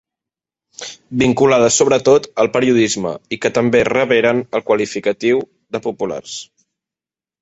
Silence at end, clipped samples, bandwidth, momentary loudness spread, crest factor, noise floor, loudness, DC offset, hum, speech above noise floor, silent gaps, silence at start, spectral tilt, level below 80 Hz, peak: 0.95 s; under 0.1%; 8.2 kHz; 15 LU; 16 dB; -90 dBFS; -15 LUFS; under 0.1%; none; 75 dB; none; 0.8 s; -4 dB/octave; -52 dBFS; 0 dBFS